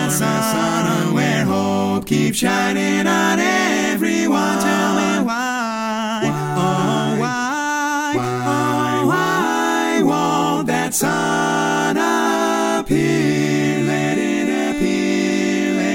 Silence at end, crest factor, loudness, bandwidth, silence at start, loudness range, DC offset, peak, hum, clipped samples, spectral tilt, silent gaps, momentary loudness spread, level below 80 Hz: 0 s; 16 dB; -18 LUFS; 17 kHz; 0 s; 2 LU; under 0.1%; -2 dBFS; none; under 0.1%; -4.5 dB/octave; none; 3 LU; -50 dBFS